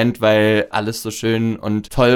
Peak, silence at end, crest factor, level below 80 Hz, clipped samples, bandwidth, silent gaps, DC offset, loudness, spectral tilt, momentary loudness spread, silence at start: 0 dBFS; 0 s; 16 dB; -40 dBFS; under 0.1%; 18 kHz; none; under 0.1%; -18 LUFS; -5.5 dB/octave; 8 LU; 0 s